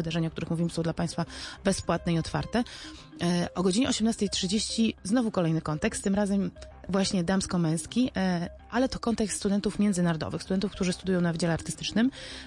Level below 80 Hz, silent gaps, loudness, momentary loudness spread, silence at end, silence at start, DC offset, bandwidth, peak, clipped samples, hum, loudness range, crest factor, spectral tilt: -50 dBFS; none; -28 LUFS; 5 LU; 0 s; 0 s; under 0.1%; 11.5 kHz; -12 dBFS; under 0.1%; none; 2 LU; 16 dB; -5 dB/octave